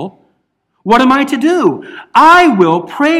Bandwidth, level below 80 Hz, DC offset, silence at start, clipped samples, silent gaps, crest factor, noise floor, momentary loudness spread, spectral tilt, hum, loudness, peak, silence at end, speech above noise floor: 15 kHz; -50 dBFS; under 0.1%; 0 s; 1%; none; 10 dB; -63 dBFS; 17 LU; -5.5 dB/octave; none; -9 LUFS; 0 dBFS; 0 s; 54 dB